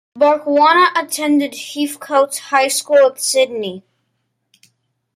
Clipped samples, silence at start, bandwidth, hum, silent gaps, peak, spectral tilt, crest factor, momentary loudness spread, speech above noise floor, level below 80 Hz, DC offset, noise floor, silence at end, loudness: under 0.1%; 0.15 s; 16 kHz; none; none; -2 dBFS; -2 dB/octave; 14 dB; 11 LU; 55 dB; -68 dBFS; under 0.1%; -70 dBFS; 1.35 s; -15 LUFS